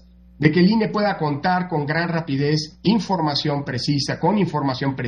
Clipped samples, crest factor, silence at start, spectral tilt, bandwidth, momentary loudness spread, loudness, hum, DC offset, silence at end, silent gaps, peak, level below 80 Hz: under 0.1%; 18 dB; 0.4 s; -6.5 dB/octave; 9.8 kHz; 5 LU; -21 LUFS; none; under 0.1%; 0 s; none; -2 dBFS; -52 dBFS